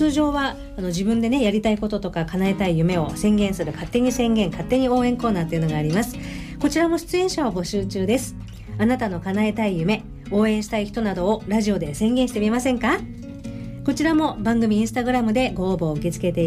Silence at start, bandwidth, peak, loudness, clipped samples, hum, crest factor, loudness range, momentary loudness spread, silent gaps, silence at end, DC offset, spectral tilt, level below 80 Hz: 0 s; 15.5 kHz; -8 dBFS; -22 LUFS; under 0.1%; none; 12 dB; 2 LU; 7 LU; none; 0 s; under 0.1%; -6 dB/octave; -40 dBFS